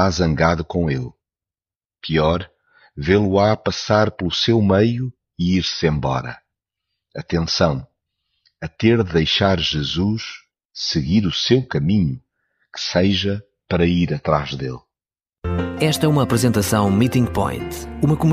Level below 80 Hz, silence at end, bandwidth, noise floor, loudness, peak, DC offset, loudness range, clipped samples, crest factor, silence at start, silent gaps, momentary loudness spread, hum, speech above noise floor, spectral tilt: -40 dBFS; 0 s; 15.5 kHz; under -90 dBFS; -19 LUFS; -2 dBFS; under 0.1%; 4 LU; under 0.1%; 18 dB; 0 s; 1.76-1.80 s, 10.65-10.69 s; 14 LU; none; over 72 dB; -5.5 dB/octave